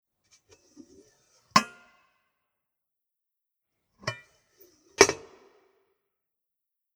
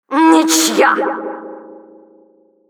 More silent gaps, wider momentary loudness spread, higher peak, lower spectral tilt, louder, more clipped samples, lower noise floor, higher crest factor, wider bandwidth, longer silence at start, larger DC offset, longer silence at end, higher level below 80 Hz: neither; first, 22 LU vs 19 LU; about the same, 0 dBFS vs 0 dBFS; about the same, -2 dB/octave vs -1.5 dB/octave; second, -25 LUFS vs -12 LUFS; neither; first, -86 dBFS vs -51 dBFS; first, 34 dB vs 16 dB; about the same, 19.5 kHz vs over 20 kHz; first, 1.55 s vs 0.1 s; neither; first, 1.8 s vs 0.95 s; first, -62 dBFS vs -84 dBFS